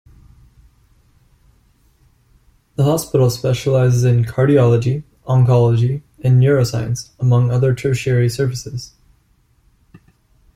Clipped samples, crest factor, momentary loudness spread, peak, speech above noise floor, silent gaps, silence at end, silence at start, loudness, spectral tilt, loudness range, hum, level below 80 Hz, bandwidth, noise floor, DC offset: under 0.1%; 14 dB; 11 LU; -2 dBFS; 43 dB; none; 1.7 s; 2.8 s; -16 LUFS; -7 dB/octave; 6 LU; none; -46 dBFS; 15 kHz; -57 dBFS; under 0.1%